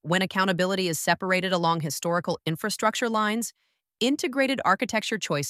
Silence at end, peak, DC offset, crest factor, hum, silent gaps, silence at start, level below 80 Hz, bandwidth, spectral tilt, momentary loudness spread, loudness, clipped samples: 0 s; -6 dBFS; under 0.1%; 20 dB; none; none; 0.05 s; -70 dBFS; 16 kHz; -4 dB/octave; 5 LU; -25 LUFS; under 0.1%